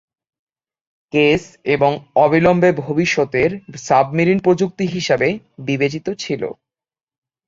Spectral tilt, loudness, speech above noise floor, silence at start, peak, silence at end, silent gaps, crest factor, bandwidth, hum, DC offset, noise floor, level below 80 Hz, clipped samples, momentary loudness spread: -6 dB/octave; -17 LUFS; over 73 dB; 1.15 s; -2 dBFS; 0.95 s; none; 16 dB; 7.8 kHz; none; under 0.1%; under -90 dBFS; -52 dBFS; under 0.1%; 10 LU